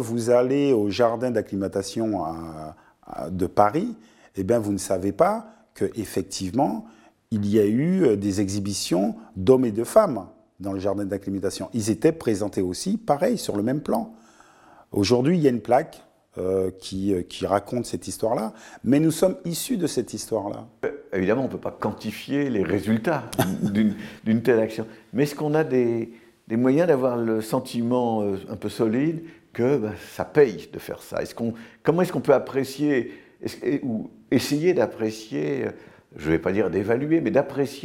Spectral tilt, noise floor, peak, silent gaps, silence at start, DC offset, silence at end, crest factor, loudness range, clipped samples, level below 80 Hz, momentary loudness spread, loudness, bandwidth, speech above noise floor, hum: -6 dB/octave; -53 dBFS; -4 dBFS; none; 0 s; under 0.1%; 0 s; 20 dB; 3 LU; under 0.1%; -58 dBFS; 12 LU; -24 LUFS; 17 kHz; 29 dB; none